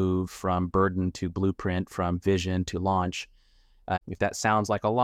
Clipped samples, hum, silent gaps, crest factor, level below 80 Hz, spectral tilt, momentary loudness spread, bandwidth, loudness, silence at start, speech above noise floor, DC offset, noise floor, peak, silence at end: under 0.1%; none; none; 18 dB; -50 dBFS; -6 dB/octave; 8 LU; 15 kHz; -28 LUFS; 0 s; 33 dB; under 0.1%; -60 dBFS; -10 dBFS; 0 s